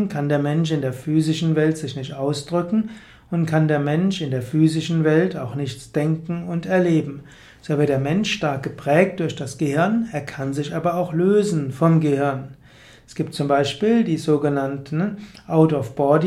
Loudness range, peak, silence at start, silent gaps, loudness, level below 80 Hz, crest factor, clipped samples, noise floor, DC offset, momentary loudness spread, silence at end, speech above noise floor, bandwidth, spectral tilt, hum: 2 LU; -2 dBFS; 0 s; none; -21 LUFS; -56 dBFS; 18 dB; under 0.1%; -48 dBFS; under 0.1%; 10 LU; 0 s; 27 dB; 12.5 kHz; -7 dB/octave; none